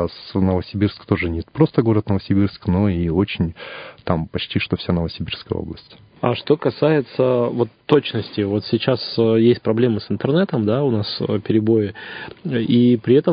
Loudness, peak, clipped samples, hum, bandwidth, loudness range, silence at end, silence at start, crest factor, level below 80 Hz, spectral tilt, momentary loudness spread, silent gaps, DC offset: -19 LUFS; 0 dBFS; under 0.1%; none; 5.2 kHz; 4 LU; 0 s; 0 s; 18 dB; -40 dBFS; -11 dB/octave; 10 LU; none; under 0.1%